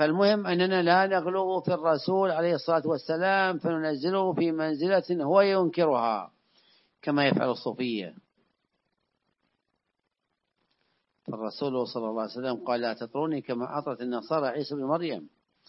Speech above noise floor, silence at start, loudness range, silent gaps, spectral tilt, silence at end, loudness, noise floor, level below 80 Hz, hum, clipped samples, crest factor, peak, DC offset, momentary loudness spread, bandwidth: 55 dB; 0 s; 11 LU; none; -9.5 dB/octave; 0.4 s; -27 LUFS; -82 dBFS; -80 dBFS; none; under 0.1%; 20 dB; -8 dBFS; under 0.1%; 10 LU; 5.8 kHz